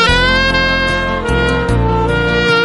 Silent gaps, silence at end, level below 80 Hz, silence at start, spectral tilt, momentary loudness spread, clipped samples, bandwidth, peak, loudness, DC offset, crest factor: none; 0 s; -22 dBFS; 0 s; -5 dB/octave; 4 LU; under 0.1%; 11.5 kHz; 0 dBFS; -13 LUFS; 0.5%; 12 dB